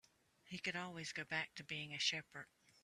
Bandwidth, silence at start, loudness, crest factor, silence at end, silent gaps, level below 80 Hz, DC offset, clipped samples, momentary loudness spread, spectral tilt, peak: 13.5 kHz; 0.45 s; -43 LUFS; 22 dB; 0.4 s; none; -82 dBFS; under 0.1%; under 0.1%; 16 LU; -2 dB/octave; -24 dBFS